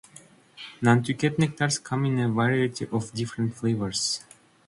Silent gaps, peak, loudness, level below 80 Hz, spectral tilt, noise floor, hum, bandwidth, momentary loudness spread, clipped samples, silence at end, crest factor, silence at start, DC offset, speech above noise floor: none; -6 dBFS; -26 LUFS; -60 dBFS; -5 dB/octave; -52 dBFS; none; 11.5 kHz; 8 LU; under 0.1%; 0.5 s; 20 dB; 0.15 s; under 0.1%; 28 dB